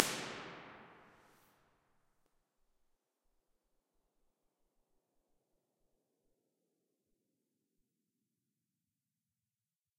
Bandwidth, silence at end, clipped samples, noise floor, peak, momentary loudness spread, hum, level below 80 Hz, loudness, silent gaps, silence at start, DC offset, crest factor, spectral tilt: 15 kHz; 8.8 s; under 0.1%; under -90 dBFS; -2 dBFS; 23 LU; none; -84 dBFS; -42 LUFS; none; 0 s; under 0.1%; 50 dB; -1.5 dB/octave